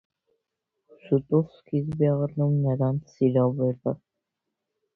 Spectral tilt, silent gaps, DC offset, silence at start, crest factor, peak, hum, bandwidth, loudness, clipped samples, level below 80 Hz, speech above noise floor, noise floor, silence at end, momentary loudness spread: -11.5 dB/octave; none; under 0.1%; 1.05 s; 18 dB; -10 dBFS; none; 6 kHz; -25 LUFS; under 0.1%; -60 dBFS; 59 dB; -83 dBFS; 1 s; 7 LU